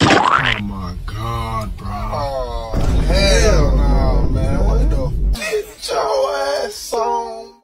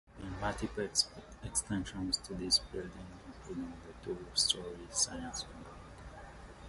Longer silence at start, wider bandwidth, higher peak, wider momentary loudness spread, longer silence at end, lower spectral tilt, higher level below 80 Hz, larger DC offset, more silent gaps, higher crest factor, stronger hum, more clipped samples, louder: about the same, 0 s vs 0.05 s; first, 15 kHz vs 12 kHz; first, 0 dBFS vs -16 dBFS; second, 11 LU vs 20 LU; first, 0.15 s vs 0 s; first, -5 dB/octave vs -2.5 dB/octave; first, -20 dBFS vs -54 dBFS; neither; neither; second, 16 dB vs 22 dB; neither; neither; first, -18 LUFS vs -35 LUFS